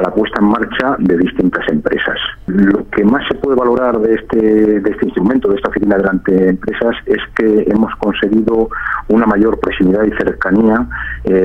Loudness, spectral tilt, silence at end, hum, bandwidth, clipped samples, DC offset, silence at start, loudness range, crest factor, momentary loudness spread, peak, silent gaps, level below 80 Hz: -13 LUFS; -8.5 dB/octave; 0 s; none; 5.8 kHz; under 0.1%; under 0.1%; 0 s; 1 LU; 12 dB; 5 LU; 0 dBFS; none; -34 dBFS